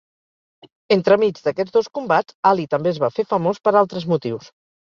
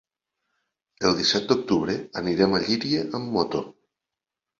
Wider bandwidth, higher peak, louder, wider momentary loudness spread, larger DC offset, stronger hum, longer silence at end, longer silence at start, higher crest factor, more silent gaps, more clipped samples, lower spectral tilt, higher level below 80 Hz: about the same, 7.2 kHz vs 7.8 kHz; first, -2 dBFS vs -6 dBFS; first, -19 LUFS vs -24 LUFS; about the same, 6 LU vs 7 LU; neither; neither; second, 0.45 s vs 0.9 s; about the same, 0.9 s vs 1 s; about the same, 18 dB vs 20 dB; first, 2.35-2.43 s vs none; neither; first, -7 dB/octave vs -4.5 dB/octave; second, -64 dBFS vs -56 dBFS